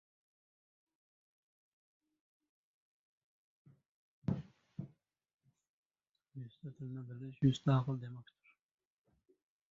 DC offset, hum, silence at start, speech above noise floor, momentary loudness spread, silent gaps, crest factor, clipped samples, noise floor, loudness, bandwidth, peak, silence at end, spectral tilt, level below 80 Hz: under 0.1%; none; 4.25 s; over 53 dB; 19 LU; 5.34-5.39 s, 5.69-5.90 s, 6.09-6.14 s; 24 dB; under 0.1%; under -90 dBFS; -38 LUFS; 7.4 kHz; -20 dBFS; 1.5 s; -8 dB/octave; -70 dBFS